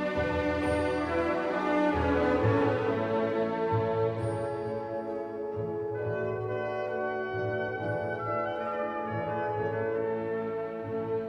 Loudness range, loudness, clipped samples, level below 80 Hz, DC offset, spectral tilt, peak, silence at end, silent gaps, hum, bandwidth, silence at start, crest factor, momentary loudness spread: 5 LU; -30 LUFS; under 0.1%; -50 dBFS; under 0.1%; -7.5 dB/octave; -14 dBFS; 0 s; none; none; 9.6 kHz; 0 s; 16 dB; 8 LU